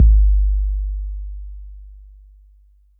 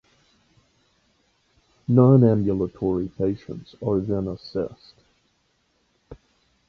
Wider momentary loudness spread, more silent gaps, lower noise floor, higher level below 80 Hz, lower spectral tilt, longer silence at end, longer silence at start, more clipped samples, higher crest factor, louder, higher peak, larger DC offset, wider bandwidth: first, 24 LU vs 18 LU; neither; second, -52 dBFS vs -68 dBFS; first, -18 dBFS vs -50 dBFS; first, -14 dB/octave vs -11 dB/octave; first, 1.05 s vs 0.55 s; second, 0 s vs 1.9 s; neither; second, 14 dB vs 20 dB; about the same, -21 LUFS vs -22 LUFS; about the same, -4 dBFS vs -4 dBFS; neither; second, 0.3 kHz vs 5.8 kHz